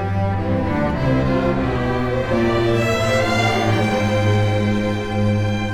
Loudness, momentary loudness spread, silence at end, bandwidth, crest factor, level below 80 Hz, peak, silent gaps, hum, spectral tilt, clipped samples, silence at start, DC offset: -19 LUFS; 3 LU; 0 s; 14 kHz; 12 dB; -34 dBFS; -6 dBFS; none; none; -6.5 dB/octave; under 0.1%; 0 s; under 0.1%